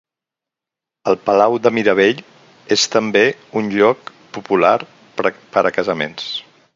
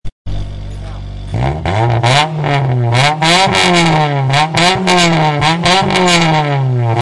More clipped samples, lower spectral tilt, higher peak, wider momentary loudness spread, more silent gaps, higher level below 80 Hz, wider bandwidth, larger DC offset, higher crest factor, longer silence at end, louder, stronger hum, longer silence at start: neither; about the same, -3.5 dB/octave vs -4.5 dB/octave; about the same, 0 dBFS vs 0 dBFS; second, 12 LU vs 16 LU; second, none vs 0.12-0.25 s; second, -60 dBFS vs -30 dBFS; second, 7.6 kHz vs 11.5 kHz; neither; first, 18 dB vs 12 dB; first, 0.35 s vs 0 s; second, -16 LUFS vs -11 LUFS; neither; first, 1.05 s vs 0.05 s